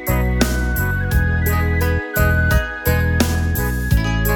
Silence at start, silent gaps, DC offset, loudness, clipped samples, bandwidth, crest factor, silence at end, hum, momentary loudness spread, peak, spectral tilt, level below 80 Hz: 0 s; none; under 0.1%; -18 LUFS; under 0.1%; 19 kHz; 16 dB; 0 s; none; 3 LU; 0 dBFS; -5.5 dB/octave; -22 dBFS